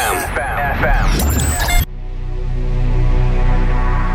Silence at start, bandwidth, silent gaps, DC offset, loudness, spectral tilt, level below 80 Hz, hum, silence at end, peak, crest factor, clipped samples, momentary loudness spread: 0 s; 17 kHz; none; under 0.1%; -18 LUFS; -4.5 dB/octave; -16 dBFS; 60 Hz at -40 dBFS; 0 s; -2 dBFS; 14 dB; under 0.1%; 9 LU